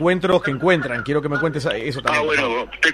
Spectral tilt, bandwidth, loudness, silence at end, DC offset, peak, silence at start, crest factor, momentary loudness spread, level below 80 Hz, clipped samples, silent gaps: -5.5 dB/octave; 13 kHz; -20 LUFS; 0 s; under 0.1%; 0 dBFS; 0 s; 18 dB; 5 LU; -48 dBFS; under 0.1%; none